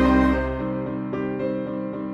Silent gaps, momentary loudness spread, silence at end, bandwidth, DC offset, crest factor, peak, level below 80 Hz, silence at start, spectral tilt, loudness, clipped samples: none; 9 LU; 0 s; 6.8 kHz; under 0.1%; 18 dB; -6 dBFS; -34 dBFS; 0 s; -8.5 dB/octave; -25 LUFS; under 0.1%